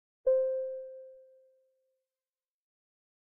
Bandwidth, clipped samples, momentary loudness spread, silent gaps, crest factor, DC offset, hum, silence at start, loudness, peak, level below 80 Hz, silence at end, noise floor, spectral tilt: 1.7 kHz; under 0.1%; 22 LU; none; 18 dB; under 0.1%; none; 0.25 s; -32 LUFS; -20 dBFS; -76 dBFS; 2.15 s; under -90 dBFS; 1 dB/octave